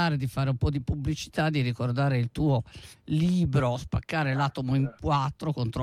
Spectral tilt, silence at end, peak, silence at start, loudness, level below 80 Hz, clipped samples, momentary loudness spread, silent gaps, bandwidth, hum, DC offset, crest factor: -7 dB/octave; 0 s; -14 dBFS; 0 s; -28 LUFS; -44 dBFS; under 0.1%; 5 LU; none; 13 kHz; none; under 0.1%; 12 dB